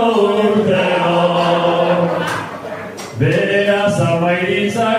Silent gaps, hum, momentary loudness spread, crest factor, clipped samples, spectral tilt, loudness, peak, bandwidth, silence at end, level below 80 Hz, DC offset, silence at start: none; none; 11 LU; 14 dB; under 0.1%; -6 dB/octave; -15 LUFS; -2 dBFS; 15 kHz; 0 s; -56 dBFS; under 0.1%; 0 s